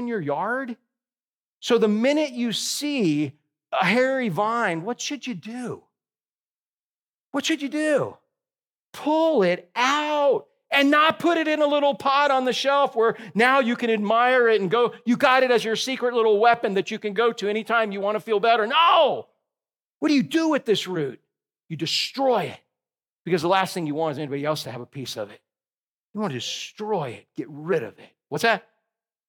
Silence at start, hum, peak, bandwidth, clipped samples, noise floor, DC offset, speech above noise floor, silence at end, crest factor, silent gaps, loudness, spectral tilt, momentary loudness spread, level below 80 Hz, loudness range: 0 s; none; -4 dBFS; 17.5 kHz; under 0.1%; under -90 dBFS; under 0.1%; over 68 dB; 0.7 s; 20 dB; 1.36-1.61 s, 6.31-7.07 s, 7.14-7.32 s, 8.81-8.93 s, 19.85-20.01 s, 23.12-23.25 s, 25.78-26.14 s; -22 LUFS; -4 dB/octave; 14 LU; -80 dBFS; 9 LU